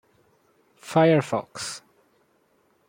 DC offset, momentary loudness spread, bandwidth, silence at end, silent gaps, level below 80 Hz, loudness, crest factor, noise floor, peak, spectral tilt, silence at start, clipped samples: under 0.1%; 20 LU; 16.5 kHz; 1.1 s; none; -70 dBFS; -23 LUFS; 20 dB; -65 dBFS; -6 dBFS; -5.5 dB/octave; 0.85 s; under 0.1%